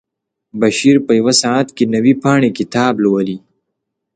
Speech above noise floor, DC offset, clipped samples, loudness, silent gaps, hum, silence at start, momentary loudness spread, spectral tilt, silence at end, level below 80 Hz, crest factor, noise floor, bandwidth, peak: 62 dB; under 0.1%; under 0.1%; -13 LUFS; none; none; 0.55 s; 7 LU; -4.5 dB/octave; 0.75 s; -58 dBFS; 14 dB; -75 dBFS; 9.4 kHz; 0 dBFS